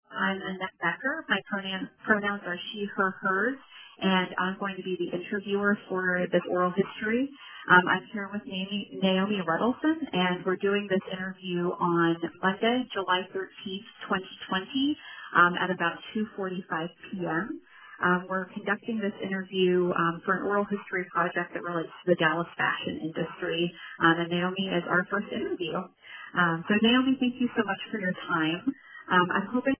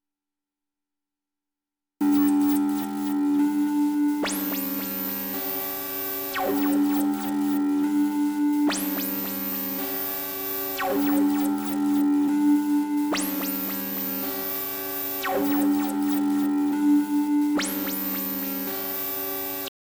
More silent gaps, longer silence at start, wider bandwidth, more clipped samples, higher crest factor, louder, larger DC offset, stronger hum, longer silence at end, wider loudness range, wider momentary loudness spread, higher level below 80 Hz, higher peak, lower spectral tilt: neither; second, 0.1 s vs 2 s; second, 3.5 kHz vs over 20 kHz; neither; first, 24 dB vs 12 dB; second, -28 LUFS vs -25 LUFS; neither; neither; second, 0.05 s vs 0.3 s; about the same, 3 LU vs 2 LU; first, 10 LU vs 6 LU; about the same, -66 dBFS vs -64 dBFS; first, -4 dBFS vs -14 dBFS; about the same, -3.5 dB/octave vs -4 dB/octave